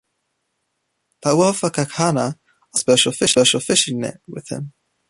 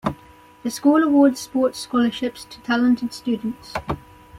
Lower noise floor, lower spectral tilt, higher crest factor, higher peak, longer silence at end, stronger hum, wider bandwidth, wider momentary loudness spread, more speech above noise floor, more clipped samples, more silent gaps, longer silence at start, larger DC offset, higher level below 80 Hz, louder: first, -73 dBFS vs -48 dBFS; second, -3.5 dB/octave vs -5 dB/octave; about the same, 20 dB vs 16 dB; about the same, -2 dBFS vs -4 dBFS; first, 0.4 s vs 0 s; neither; second, 11.5 kHz vs 15.5 kHz; about the same, 16 LU vs 15 LU; first, 55 dB vs 28 dB; neither; neither; first, 1.25 s vs 0.05 s; neither; second, -58 dBFS vs -50 dBFS; first, -17 LUFS vs -21 LUFS